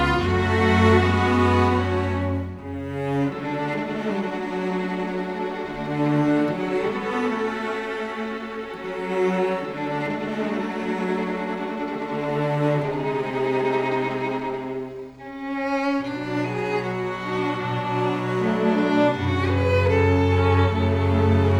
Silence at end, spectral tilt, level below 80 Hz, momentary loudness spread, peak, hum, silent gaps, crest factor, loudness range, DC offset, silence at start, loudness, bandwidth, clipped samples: 0 s; -7.5 dB/octave; -46 dBFS; 10 LU; -4 dBFS; none; none; 18 dB; 6 LU; under 0.1%; 0 s; -23 LUFS; 19.5 kHz; under 0.1%